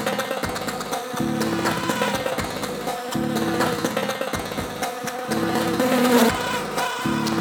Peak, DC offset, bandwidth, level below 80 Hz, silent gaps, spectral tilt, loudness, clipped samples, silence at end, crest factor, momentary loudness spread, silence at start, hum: -4 dBFS; under 0.1%; over 20 kHz; -48 dBFS; none; -4 dB/octave; -23 LUFS; under 0.1%; 0 s; 20 dB; 9 LU; 0 s; none